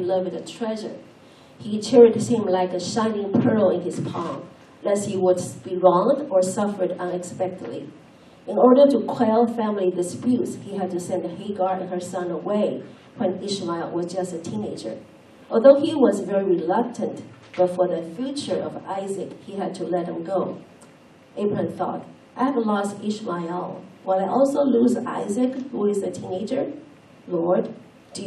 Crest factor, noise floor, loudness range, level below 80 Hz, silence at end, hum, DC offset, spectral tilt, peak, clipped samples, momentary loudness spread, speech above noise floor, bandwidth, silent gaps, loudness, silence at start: 22 dB; -50 dBFS; 7 LU; -72 dBFS; 0 s; none; under 0.1%; -6 dB/octave; -2 dBFS; under 0.1%; 15 LU; 28 dB; 12.5 kHz; none; -23 LUFS; 0 s